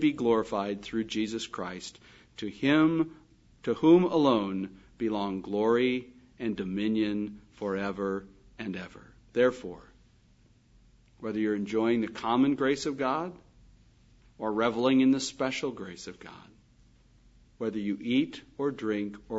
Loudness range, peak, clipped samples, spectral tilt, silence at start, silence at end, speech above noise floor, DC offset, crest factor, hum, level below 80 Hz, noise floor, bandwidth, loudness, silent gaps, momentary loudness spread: 7 LU; -10 dBFS; under 0.1%; -5.5 dB/octave; 0 s; 0 s; 33 dB; under 0.1%; 20 dB; none; -62 dBFS; -62 dBFS; 8 kHz; -29 LUFS; none; 17 LU